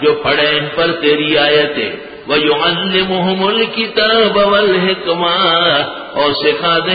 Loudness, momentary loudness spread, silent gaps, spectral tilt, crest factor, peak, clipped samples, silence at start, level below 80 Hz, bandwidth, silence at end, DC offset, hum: -12 LUFS; 5 LU; none; -10 dB/octave; 12 dB; 0 dBFS; under 0.1%; 0 s; -48 dBFS; 5 kHz; 0 s; under 0.1%; none